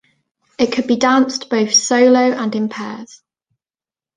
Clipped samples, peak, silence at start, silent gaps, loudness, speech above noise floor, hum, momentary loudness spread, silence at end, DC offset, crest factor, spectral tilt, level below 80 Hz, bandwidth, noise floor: under 0.1%; -2 dBFS; 0.6 s; none; -15 LUFS; over 75 dB; none; 13 LU; 1.1 s; under 0.1%; 16 dB; -3 dB/octave; -60 dBFS; 9.8 kHz; under -90 dBFS